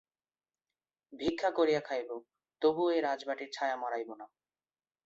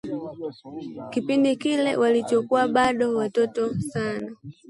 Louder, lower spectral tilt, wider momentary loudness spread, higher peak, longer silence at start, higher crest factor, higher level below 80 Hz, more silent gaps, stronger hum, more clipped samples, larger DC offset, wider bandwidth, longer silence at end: second, -33 LUFS vs -23 LUFS; about the same, -5 dB/octave vs -5.5 dB/octave; about the same, 14 LU vs 15 LU; second, -16 dBFS vs -8 dBFS; first, 1.1 s vs 0.05 s; about the same, 18 dB vs 16 dB; second, -70 dBFS vs -60 dBFS; neither; neither; neither; neither; second, 7.8 kHz vs 11.5 kHz; first, 0.8 s vs 0.15 s